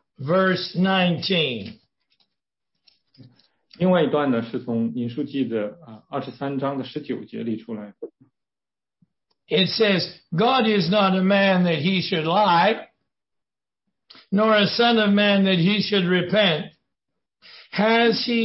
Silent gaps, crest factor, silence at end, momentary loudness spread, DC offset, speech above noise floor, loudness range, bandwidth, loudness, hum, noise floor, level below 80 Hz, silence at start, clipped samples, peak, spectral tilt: none; 16 dB; 0 s; 14 LU; under 0.1%; over 69 dB; 9 LU; 5.8 kHz; -21 LUFS; none; under -90 dBFS; -66 dBFS; 0.2 s; under 0.1%; -6 dBFS; -9 dB/octave